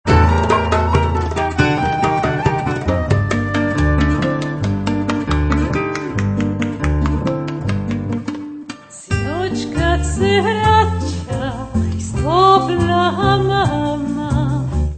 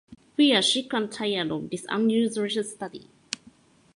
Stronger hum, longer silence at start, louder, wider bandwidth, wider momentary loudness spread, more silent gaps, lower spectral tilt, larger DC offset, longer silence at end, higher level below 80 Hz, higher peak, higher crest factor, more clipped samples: neither; about the same, 0.05 s vs 0.1 s; first, -17 LUFS vs -25 LUFS; second, 9.2 kHz vs 11.5 kHz; second, 8 LU vs 16 LU; neither; first, -6.5 dB/octave vs -3.5 dB/octave; neither; second, 0 s vs 0.6 s; first, -26 dBFS vs -68 dBFS; first, 0 dBFS vs -4 dBFS; second, 16 dB vs 22 dB; neither